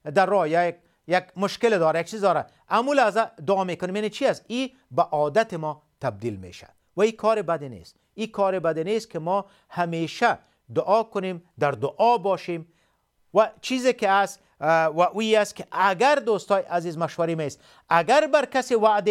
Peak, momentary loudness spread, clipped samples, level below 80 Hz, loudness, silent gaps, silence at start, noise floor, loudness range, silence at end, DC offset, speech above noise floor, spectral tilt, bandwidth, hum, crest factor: -4 dBFS; 10 LU; under 0.1%; -70 dBFS; -24 LUFS; none; 0.05 s; -67 dBFS; 4 LU; 0 s; under 0.1%; 44 dB; -5 dB/octave; 14.5 kHz; none; 18 dB